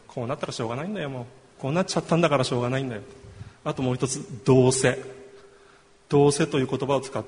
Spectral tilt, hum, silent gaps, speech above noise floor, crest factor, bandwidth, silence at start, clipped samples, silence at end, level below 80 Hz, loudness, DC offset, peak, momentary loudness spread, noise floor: -5.5 dB/octave; none; none; 31 dB; 20 dB; 10.5 kHz; 0.15 s; under 0.1%; 0 s; -56 dBFS; -25 LUFS; under 0.1%; -4 dBFS; 15 LU; -55 dBFS